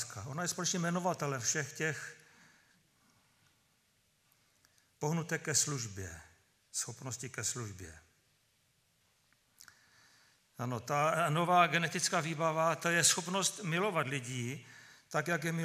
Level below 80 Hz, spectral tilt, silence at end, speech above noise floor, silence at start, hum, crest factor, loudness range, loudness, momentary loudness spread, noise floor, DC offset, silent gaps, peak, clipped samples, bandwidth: -74 dBFS; -3 dB/octave; 0 s; 40 dB; 0 s; none; 24 dB; 15 LU; -33 LUFS; 16 LU; -74 dBFS; under 0.1%; none; -12 dBFS; under 0.1%; 15.5 kHz